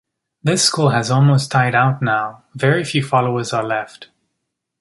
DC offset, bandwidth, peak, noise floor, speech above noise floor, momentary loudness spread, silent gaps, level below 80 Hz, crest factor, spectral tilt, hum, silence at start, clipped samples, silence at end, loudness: under 0.1%; 11.5 kHz; -2 dBFS; -76 dBFS; 60 dB; 9 LU; none; -58 dBFS; 16 dB; -4.5 dB/octave; none; 0.45 s; under 0.1%; 0.75 s; -17 LUFS